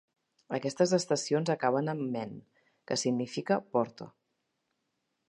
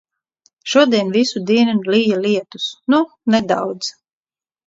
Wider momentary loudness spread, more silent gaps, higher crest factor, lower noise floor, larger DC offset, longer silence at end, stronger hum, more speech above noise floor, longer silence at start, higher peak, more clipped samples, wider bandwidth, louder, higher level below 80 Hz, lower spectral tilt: about the same, 12 LU vs 10 LU; neither; about the same, 20 dB vs 16 dB; second, -81 dBFS vs under -90 dBFS; neither; first, 1.2 s vs 0.75 s; neither; second, 51 dB vs over 74 dB; second, 0.5 s vs 0.65 s; second, -12 dBFS vs -2 dBFS; neither; first, 11.5 kHz vs 7.8 kHz; second, -31 LUFS vs -17 LUFS; second, -78 dBFS vs -62 dBFS; about the same, -5 dB/octave vs -5 dB/octave